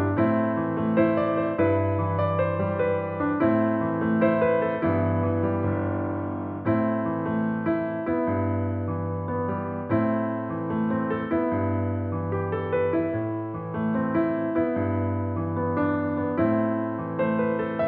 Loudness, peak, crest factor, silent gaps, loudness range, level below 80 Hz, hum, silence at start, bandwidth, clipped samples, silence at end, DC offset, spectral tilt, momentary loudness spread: -25 LUFS; -8 dBFS; 16 dB; none; 3 LU; -58 dBFS; none; 0 s; 4.3 kHz; under 0.1%; 0 s; under 0.1%; -8 dB/octave; 6 LU